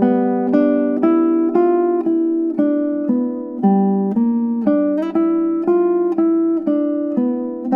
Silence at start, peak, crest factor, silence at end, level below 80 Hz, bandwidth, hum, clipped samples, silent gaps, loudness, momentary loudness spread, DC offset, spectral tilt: 0 s; -4 dBFS; 14 dB; 0 s; -68 dBFS; 3.4 kHz; none; under 0.1%; none; -17 LUFS; 4 LU; under 0.1%; -11 dB/octave